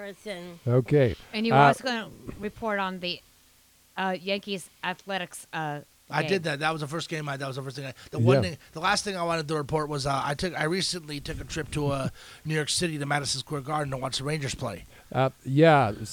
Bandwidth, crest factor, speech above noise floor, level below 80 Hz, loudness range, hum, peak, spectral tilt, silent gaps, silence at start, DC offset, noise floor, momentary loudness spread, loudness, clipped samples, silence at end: 19 kHz; 22 dB; 33 dB; -52 dBFS; 6 LU; none; -6 dBFS; -5 dB/octave; none; 0 s; under 0.1%; -60 dBFS; 14 LU; -27 LUFS; under 0.1%; 0 s